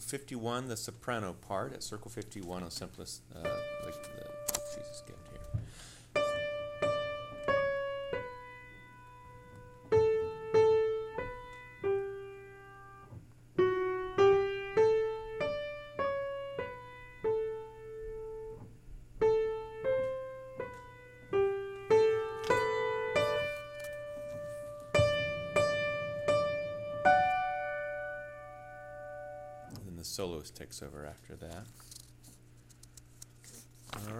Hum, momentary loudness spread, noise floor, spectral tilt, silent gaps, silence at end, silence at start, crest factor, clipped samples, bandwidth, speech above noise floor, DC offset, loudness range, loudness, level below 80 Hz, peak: none; 22 LU; -58 dBFS; -4.5 dB/octave; none; 0 s; 0 s; 24 dB; under 0.1%; 16 kHz; 17 dB; under 0.1%; 12 LU; -34 LUFS; -58 dBFS; -10 dBFS